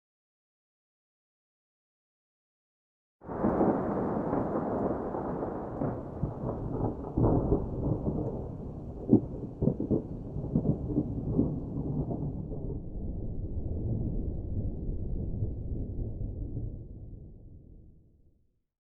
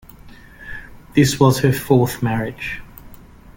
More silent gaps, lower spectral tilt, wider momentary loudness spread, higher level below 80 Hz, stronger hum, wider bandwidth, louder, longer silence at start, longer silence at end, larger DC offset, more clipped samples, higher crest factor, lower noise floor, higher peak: neither; first, -12.5 dB/octave vs -6 dB/octave; second, 12 LU vs 20 LU; about the same, -42 dBFS vs -42 dBFS; neither; second, 2.8 kHz vs 17 kHz; second, -33 LUFS vs -18 LUFS; first, 3.2 s vs 0.25 s; first, 0.9 s vs 0.4 s; neither; neither; first, 24 dB vs 18 dB; first, -67 dBFS vs -41 dBFS; second, -8 dBFS vs -2 dBFS